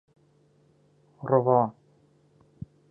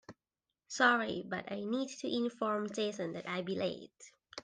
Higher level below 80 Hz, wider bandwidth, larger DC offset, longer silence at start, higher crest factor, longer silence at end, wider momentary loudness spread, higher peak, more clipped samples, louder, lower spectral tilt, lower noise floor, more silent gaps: first, -68 dBFS vs -78 dBFS; second, 2.4 kHz vs 10 kHz; neither; first, 1.2 s vs 0.1 s; about the same, 22 dB vs 20 dB; first, 1.2 s vs 0 s; first, 25 LU vs 14 LU; first, -8 dBFS vs -16 dBFS; neither; first, -24 LUFS vs -35 LUFS; first, -12 dB/octave vs -4 dB/octave; second, -63 dBFS vs under -90 dBFS; neither